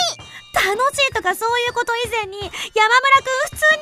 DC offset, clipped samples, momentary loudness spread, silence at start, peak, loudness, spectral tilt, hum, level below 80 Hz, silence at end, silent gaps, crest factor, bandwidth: under 0.1%; under 0.1%; 10 LU; 0 s; -2 dBFS; -17 LUFS; -1 dB/octave; none; -48 dBFS; 0 s; none; 16 dB; 15.5 kHz